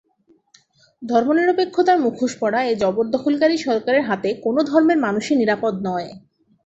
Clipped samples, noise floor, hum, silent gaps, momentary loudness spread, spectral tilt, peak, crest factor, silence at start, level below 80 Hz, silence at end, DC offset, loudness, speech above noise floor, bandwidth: under 0.1%; -59 dBFS; none; none; 6 LU; -5.5 dB/octave; -4 dBFS; 16 dB; 1 s; -62 dBFS; 0.5 s; under 0.1%; -19 LUFS; 41 dB; 8.2 kHz